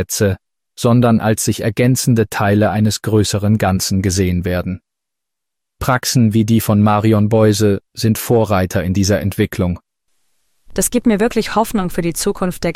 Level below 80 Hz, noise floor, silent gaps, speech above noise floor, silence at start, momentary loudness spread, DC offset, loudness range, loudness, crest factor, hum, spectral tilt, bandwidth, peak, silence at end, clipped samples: -38 dBFS; -82 dBFS; none; 67 dB; 0 s; 7 LU; under 0.1%; 4 LU; -15 LUFS; 12 dB; none; -5.5 dB/octave; 16 kHz; -4 dBFS; 0 s; under 0.1%